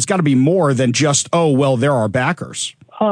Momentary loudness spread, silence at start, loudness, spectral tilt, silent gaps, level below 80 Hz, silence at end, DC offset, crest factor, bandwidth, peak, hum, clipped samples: 9 LU; 0 s; -16 LUFS; -5 dB/octave; none; -58 dBFS; 0 s; under 0.1%; 14 dB; 10.5 kHz; -2 dBFS; none; under 0.1%